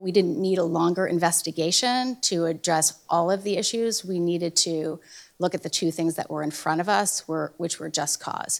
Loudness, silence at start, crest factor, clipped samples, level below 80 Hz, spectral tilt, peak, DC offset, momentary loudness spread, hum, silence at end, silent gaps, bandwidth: -24 LUFS; 0 s; 18 dB; under 0.1%; -72 dBFS; -3 dB/octave; -6 dBFS; under 0.1%; 8 LU; none; 0 s; none; 19.5 kHz